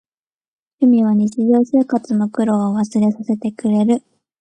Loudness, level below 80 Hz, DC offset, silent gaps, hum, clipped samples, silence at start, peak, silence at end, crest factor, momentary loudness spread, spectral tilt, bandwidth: -17 LUFS; -64 dBFS; under 0.1%; none; none; under 0.1%; 0.8 s; -4 dBFS; 0.4 s; 14 dB; 6 LU; -8 dB/octave; 9.2 kHz